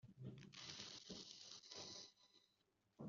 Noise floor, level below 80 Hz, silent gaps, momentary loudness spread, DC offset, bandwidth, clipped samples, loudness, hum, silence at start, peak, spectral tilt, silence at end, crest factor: -84 dBFS; -86 dBFS; none; 5 LU; under 0.1%; 7.4 kHz; under 0.1%; -56 LUFS; none; 0.05 s; -36 dBFS; -3 dB/octave; 0 s; 22 dB